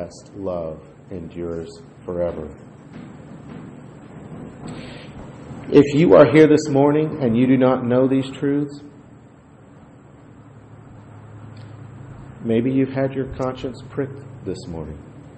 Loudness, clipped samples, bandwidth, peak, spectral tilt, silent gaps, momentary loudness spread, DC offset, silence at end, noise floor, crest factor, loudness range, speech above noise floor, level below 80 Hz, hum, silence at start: -18 LUFS; under 0.1%; 8.6 kHz; 0 dBFS; -7.5 dB/octave; none; 25 LU; under 0.1%; 0.1 s; -46 dBFS; 20 dB; 17 LU; 28 dB; -50 dBFS; none; 0 s